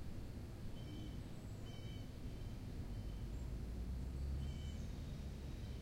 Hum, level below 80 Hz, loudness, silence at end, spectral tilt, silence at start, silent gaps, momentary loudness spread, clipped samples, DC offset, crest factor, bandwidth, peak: none; -50 dBFS; -49 LUFS; 0 s; -6.5 dB/octave; 0 s; none; 5 LU; under 0.1%; under 0.1%; 12 dB; 16 kHz; -34 dBFS